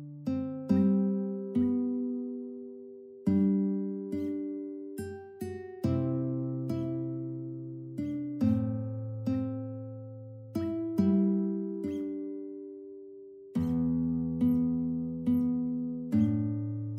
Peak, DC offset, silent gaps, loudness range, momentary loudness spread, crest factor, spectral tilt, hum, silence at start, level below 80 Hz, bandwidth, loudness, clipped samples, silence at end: -14 dBFS; under 0.1%; none; 4 LU; 15 LU; 16 dB; -10 dB/octave; none; 0 s; -60 dBFS; 13 kHz; -32 LUFS; under 0.1%; 0 s